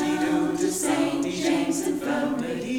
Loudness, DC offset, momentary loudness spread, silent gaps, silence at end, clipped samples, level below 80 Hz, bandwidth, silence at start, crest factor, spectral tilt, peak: -25 LUFS; under 0.1%; 3 LU; none; 0 s; under 0.1%; -56 dBFS; 18.5 kHz; 0 s; 12 dB; -4 dB/octave; -12 dBFS